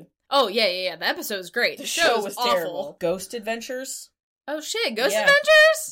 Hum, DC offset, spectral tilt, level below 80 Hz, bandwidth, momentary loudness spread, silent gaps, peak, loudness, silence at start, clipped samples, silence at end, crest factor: none; under 0.1%; -1.5 dB/octave; -64 dBFS; 17 kHz; 16 LU; 4.23-4.36 s; -8 dBFS; -21 LUFS; 0 s; under 0.1%; 0 s; 16 dB